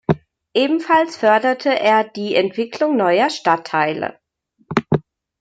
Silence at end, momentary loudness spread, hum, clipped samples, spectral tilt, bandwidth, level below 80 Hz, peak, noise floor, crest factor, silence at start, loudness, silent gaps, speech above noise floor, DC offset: 0.4 s; 8 LU; none; under 0.1%; -6 dB/octave; 9.2 kHz; -58 dBFS; -2 dBFS; -62 dBFS; 16 dB; 0.1 s; -18 LUFS; none; 45 dB; under 0.1%